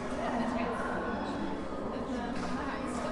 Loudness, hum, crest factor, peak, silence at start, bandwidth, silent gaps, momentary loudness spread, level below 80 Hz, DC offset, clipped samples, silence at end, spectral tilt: -35 LUFS; none; 14 dB; -22 dBFS; 0 s; 11.5 kHz; none; 4 LU; -50 dBFS; 0.1%; under 0.1%; 0 s; -5.5 dB/octave